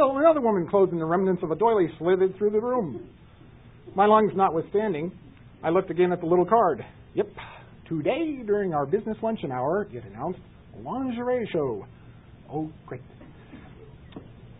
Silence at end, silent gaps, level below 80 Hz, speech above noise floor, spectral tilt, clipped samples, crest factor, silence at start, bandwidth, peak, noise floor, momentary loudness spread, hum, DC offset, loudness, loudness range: 0.05 s; none; -56 dBFS; 25 dB; -11.5 dB/octave; under 0.1%; 18 dB; 0 s; 4 kHz; -6 dBFS; -50 dBFS; 21 LU; none; under 0.1%; -25 LUFS; 9 LU